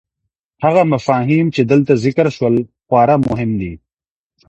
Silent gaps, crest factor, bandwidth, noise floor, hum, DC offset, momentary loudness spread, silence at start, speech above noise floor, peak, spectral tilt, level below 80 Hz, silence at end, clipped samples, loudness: none; 14 dB; 8.4 kHz; under -90 dBFS; none; under 0.1%; 6 LU; 0.6 s; over 76 dB; 0 dBFS; -8 dB/octave; -46 dBFS; 0.7 s; under 0.1%; -15 LUFS